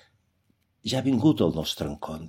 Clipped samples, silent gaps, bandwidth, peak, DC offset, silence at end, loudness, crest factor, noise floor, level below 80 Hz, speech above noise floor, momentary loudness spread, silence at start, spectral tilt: under 0.1%; none; 16 kHz; -8 dBFS; under 0.1%; 0 s; -25 LUFS; 20 dB; -70 dBFS; -52 dBFS; 45 dB; 11 LU; 0.85 s; -6 dB/octave